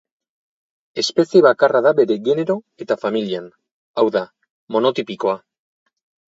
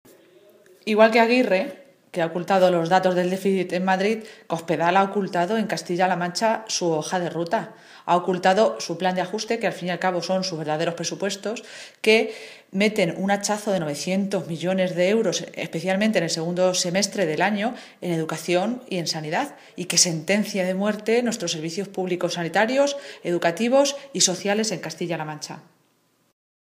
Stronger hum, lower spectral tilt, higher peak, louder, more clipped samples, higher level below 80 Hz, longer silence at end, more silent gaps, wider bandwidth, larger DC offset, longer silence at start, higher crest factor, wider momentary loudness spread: neither; about the same, -5 dB/octave vs -4 dB/octave; about the same, 0 dBFS vs -2 dBFS; first, -18 LUFS vs -23 LUFS; neither; about the same, -70 dBFS vs -74 dBFS; second, 0.9 s vs 1.1 s; first, 3.71-3.94 s, 4.50-4.67 s vs none; second, 7.8 kHz vs 15.5 kHz; neither; about the same, 0.95 s vs 0.85 s; about the same, 18 dB vs 22 dB; first, 14 LU vs 11 LU